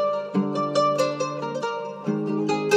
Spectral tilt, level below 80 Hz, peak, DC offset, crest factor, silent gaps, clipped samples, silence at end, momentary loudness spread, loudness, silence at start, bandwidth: -5.5 dB/octave; -88 dBFS; -8 dBFS; under 0.1%; 16 dB; none; under 0.1%; 0 s; 7 LU; -25 LUFS; 0 s; 14 kHz